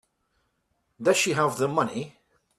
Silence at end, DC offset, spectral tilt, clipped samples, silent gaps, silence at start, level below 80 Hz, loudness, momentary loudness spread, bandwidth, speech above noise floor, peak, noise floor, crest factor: 0.5 s; under 0.1%; -4 dB/octave; under 0.1%; none; 1 s; -68 dBFS; -24 LUFS; 12 LU; 14.5 kHz; 50 dB; -10 dBFS; -74 dBFS; 18 dB